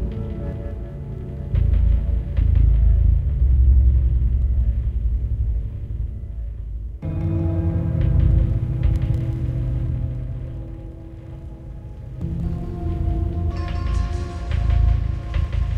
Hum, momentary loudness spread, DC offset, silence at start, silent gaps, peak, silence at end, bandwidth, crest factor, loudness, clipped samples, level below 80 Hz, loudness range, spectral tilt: none; 15 LU; under 0.1%; 0 s; none; -6 dBFS; 0 s; 4.9 kHz; 14 dB; -23 LUFS; under 0.1%; -22 dBFS; 9 LU; -9.5 dB/octave